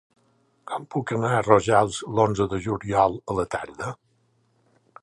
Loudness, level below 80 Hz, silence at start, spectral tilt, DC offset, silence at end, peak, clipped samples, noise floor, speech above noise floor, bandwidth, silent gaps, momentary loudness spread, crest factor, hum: -24 LUFS; -52 dBFS; 0.65 s; -6 dB/octave; under 0.1%; 1.1 s; -2 dBFS; under 0.1%; -66 dBFS; 43 dB; 11.5 kHz; none; 15 LU; 24 dB; none